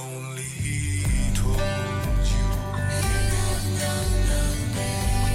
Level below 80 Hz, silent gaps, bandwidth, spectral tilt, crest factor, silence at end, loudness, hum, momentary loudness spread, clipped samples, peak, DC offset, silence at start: -26 dBFS; none; 16.5 kHz; -4.5 dB/octave; 10 dB; 0 s; -25 LUFS; none; 4 LU; under 0.1%; -12 dBFS; under 0.1%; 0 s